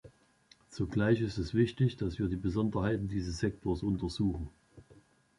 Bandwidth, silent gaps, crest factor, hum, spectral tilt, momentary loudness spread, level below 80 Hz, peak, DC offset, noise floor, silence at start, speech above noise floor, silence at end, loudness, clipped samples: 11.5 kHz; none; 18 dB; none; -7.5 dB/octave; 7 LU; -48 dBFS; -16 dBFS; under 0.1%; -65 dBFS; 0.05 s; 33 dB; 0.4 s; -33 LUFS; under 0.1%